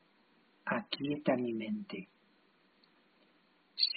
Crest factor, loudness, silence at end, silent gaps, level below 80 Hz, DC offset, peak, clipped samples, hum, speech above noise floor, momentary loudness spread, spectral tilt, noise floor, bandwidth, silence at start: 22 dB; -37 LUFS; 0 s; none; -80 dBFS; under 0.1%; -16 dBFS; under 0.1%; none; 33 dB; 14 LU; -2.5 dB/octave; -70 dBFS; 4.9 kHz; 0.65 s